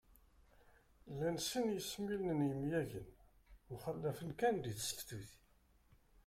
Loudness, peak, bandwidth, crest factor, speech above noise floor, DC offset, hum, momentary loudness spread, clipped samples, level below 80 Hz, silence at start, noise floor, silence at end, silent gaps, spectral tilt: -41 LUFS; -24 dBFS; 16.5 kHz; 20 dB; 31 dB; under 0.1%; none; 15 LU; under 0.1%; -66 dBFS; 1.05 s; -71 dBFS; 0.9 s; none; -5 dB/octave